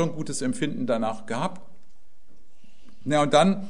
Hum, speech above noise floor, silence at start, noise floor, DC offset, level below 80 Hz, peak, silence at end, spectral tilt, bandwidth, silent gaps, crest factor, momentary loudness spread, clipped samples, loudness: none; 36 dB; 0 s; -61 dBFS; 2%; -62 dBFS; -6 dBFS; 0 s; -5 dB/octave; 11 kHz; none; 20 dB; 11 LU; under 0.1%; -25 LUFS